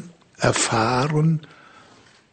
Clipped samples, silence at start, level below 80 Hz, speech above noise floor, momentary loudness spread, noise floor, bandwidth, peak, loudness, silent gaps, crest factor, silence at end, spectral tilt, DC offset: under 0.1%; 0 s; -50 dBFS; 32 dB; 4 LU; -52 dBFS; 9.4 kHz; -2 dBFS; -21 LUFS; none; 20 dB; 0.9 s; -4.5 dB/octave; under 0.1%